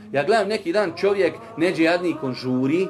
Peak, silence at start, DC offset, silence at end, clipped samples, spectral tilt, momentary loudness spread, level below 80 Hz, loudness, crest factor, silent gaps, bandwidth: -6 dBFS; 0 s; under 0.1%; 0 s; under 0.1%; -6 dB/octave; 5 LU; -62 dBFS; -22 LUFS; 14 dB; none; 12.5 kHz